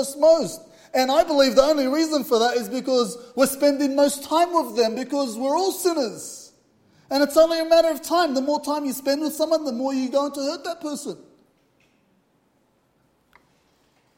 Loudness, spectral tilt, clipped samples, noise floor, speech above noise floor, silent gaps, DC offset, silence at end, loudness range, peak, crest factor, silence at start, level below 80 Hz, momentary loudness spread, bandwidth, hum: -21 LUFS; -3 dB/octave; under 0.1%; -65 dBFS; 44 dB; none; under 0.1%; 2.95 s; 9 LU; -2 dBFS; 20 dB; 0 s; -58 dBFS; 12 LU; 16.5 kHz; none